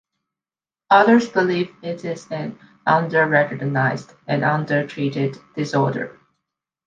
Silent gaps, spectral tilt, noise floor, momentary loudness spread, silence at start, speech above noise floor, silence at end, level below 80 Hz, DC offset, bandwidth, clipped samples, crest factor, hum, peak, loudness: none; -7 dB/octave; under -90 dBFS; 14 LU; 0.9 s; over 71 dB; 0.75 s; -66 dBFS; under 0.1%; 7.6 kHz; under 0.1%; 20 dB; none; -2 dBFS; -20 LUFS